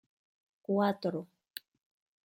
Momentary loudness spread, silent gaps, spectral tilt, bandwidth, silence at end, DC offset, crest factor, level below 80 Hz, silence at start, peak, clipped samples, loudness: 17 LU; none; -7 dB/octave; 16 kHz; 1 s; under 0.1%; 20 dB; -84 dBFS; 0.7 s; -16 dBFS; under 0.1%; -33 LUFS